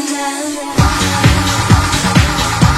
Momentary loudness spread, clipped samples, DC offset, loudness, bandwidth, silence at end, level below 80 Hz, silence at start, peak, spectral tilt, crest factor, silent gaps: 6 LU; 0.4%; under 0.1%; -13 LUFS; 16 kHz; 0 s; -20 dBFS; 0 s; 0 dBFS; -4.5 dB/octave; 12 dB; none